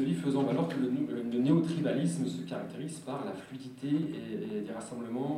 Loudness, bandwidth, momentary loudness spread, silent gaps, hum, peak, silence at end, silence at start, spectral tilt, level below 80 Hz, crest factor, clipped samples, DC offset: -33 LUFS; 13 kHz; 12 LU; none; none; -14 dBFS; 0 s; 0 s; -7 dB/octave; -72 dBFS; 18 dB; under 0.1%; under 0.1%